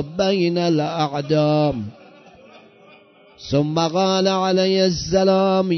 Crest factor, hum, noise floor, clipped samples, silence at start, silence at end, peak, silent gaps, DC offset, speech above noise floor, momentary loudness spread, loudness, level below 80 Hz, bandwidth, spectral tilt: 16 dB; none; -49 dBFS; under 0.1%; 0 s; 0 s; -4 dBFS; none; under 0.1%; 31 dB; 6 LU; -19 LUFS; -50 dBFS; 6.4 kHz; -5 dB/octave